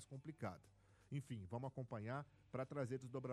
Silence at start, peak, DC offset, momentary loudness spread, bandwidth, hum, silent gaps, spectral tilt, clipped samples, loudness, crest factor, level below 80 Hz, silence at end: 0 s; -32 dBFS; under 0.1%; 6 LU; 12.5 kHz; none; none; -7.5 dB/octave; under 0.1%; -50 LUFS; 18 dB; -78 dBFS; 0 s